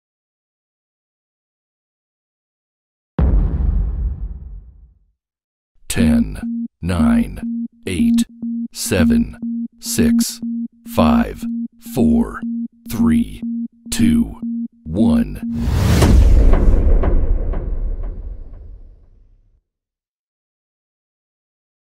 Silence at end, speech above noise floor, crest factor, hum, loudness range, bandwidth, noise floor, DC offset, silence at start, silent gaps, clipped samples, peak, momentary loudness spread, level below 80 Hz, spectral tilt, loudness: 2.9 s; 70 dB; 18 dB; none; 8 LU; 16 kHz; -86 dBFS; under 0.1%; 3.2 s; 5.44-5.75 s; under 0.1%; 0 dBFS; 12 LU; -22 dBFS; -6 dB/octave; -18 LUFS